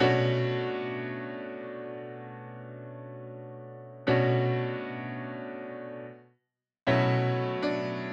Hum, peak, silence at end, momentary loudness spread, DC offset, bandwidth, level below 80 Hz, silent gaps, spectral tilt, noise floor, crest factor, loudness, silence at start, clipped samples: none; -12 dBFS; 0 s; 18 LU; under 0.1%; 7 kHz; -68 dBFS; none; -8 dB/octave; -77 dBFS; 20 dB; -30 LUFS; 0 s; under 0.1%